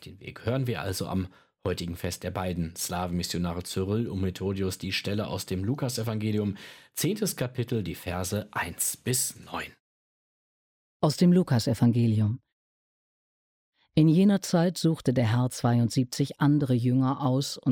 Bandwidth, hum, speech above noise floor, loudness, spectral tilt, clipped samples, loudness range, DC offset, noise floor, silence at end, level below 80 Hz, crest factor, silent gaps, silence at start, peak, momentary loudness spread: 17.5 kHz; none; over 63 dB; -27 LUFS; -5.5 dB/octave; under 0.1%; 6 LU; under 0.1%; under -90 dBFS; 0 s; -56 dBFS; 16 dB; 9.80-11.00 s, 12.53-13.72 s; 0 s; -10 dBFS; 10 LU